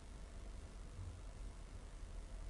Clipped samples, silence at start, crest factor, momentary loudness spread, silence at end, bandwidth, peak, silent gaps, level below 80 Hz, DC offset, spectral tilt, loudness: under 0.1%; 0 s; 12 dB; 3 LU; 0 s; 11.5 kHz; -40 dBFS; none; -52 dBFS; under 0.1%; -5.5 dB/octave; -55 LUFS